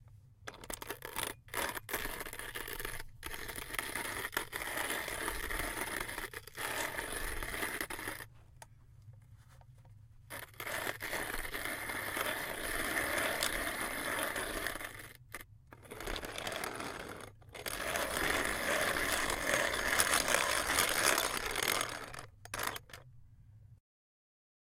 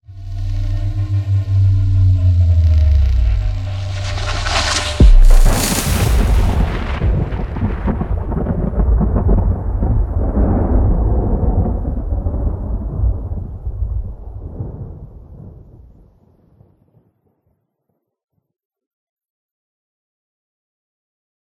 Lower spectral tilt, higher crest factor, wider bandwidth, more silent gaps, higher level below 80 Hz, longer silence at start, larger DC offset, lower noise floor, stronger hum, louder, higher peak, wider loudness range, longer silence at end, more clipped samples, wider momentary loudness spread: second, -1.5 dB/octave vs -5.5 dB/octave; first, 28 dB vs 16 dB; about the same, 17 kHz vs 17.5 kHz; neither; second, -52 dBFS vs -18 dBFS; about the same, 0 s vs 0.1 s; neither; second, -58 dBFS vs -71 dBFS; neither; second, -36 LUFS vs -17 LUFS; second, -10 dBFS vs 0 dBFS; second, 11 LU vs 14 LU; second, 0.85 s vs 6 s; neither; first, 17 LU vs 14 LU